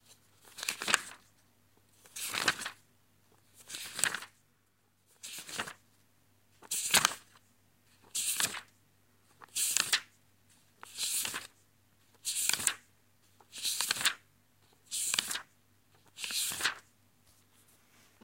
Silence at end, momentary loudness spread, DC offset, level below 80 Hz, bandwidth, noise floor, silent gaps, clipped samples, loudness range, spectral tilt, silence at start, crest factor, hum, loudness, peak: 1.45 s; 18 LU; under 0.1%; -76 dBFS; 16.5 kHz; -73 dBFS; none; under 0.1%; 5 LU; 1 dB/octave; 0.1 s; 34 dB; none; -33 LUFS; -4 dBFS